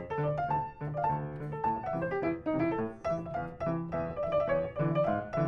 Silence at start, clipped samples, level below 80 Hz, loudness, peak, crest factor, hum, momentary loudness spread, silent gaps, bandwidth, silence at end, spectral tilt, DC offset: 0 s; under 0.1%; -56 dBFS; -33 LUFS; -18 dBFS; 14 dB; none; 6 LU; none; 6.6 kHz; 0 s; -9.5 dB/octave; under 0.1%